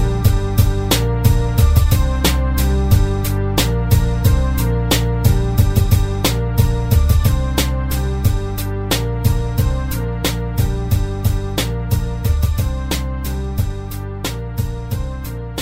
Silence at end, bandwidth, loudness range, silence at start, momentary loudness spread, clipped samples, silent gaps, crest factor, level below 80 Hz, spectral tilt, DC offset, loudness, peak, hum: 0 s; 16.5 kHz; 5 LU; 0 s; 8 LU; under 0.1%; none; 16 dB; -20 dBFS; -5.5 dB/octave; under 0.1%; -18 LUFS; 0 dBFS; none